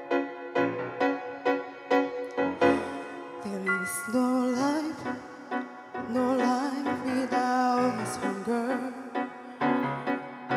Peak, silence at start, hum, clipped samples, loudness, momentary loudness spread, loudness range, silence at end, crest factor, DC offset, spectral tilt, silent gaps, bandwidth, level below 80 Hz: -10 dBFS; 0 s; none; under 0.1%; -29 LUFS; 11 LU; 1 LU; 0 s; 18 dB; under 0.1%; -5 dB/octave; none; 15.5 kHz; -72 dBFS